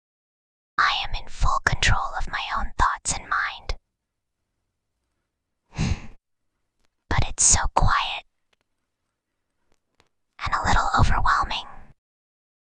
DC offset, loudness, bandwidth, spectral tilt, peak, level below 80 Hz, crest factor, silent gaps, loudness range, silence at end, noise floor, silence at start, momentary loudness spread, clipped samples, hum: under 0.1%; -23 LUFS; 10 kHz; -2 dB/octave; -4 dBFS; -32 dBFS; 22 dB; none; 9 LU; 0.8 s; -80 dBFS; 0.8 s; 13 LU; under 0.1%; none